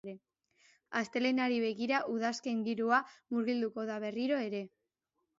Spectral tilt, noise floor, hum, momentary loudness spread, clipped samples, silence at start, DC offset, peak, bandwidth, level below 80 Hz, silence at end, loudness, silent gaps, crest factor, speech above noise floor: -3 dB/octave; -84 dBFS; none; 9 LU; under 0.1%; 0.05 s; under 0.1%; -16 dBFS; 7.6 kHz; -84 dBFS; 0.7 s; -34 LUFS; none; 18 dB; 51 dB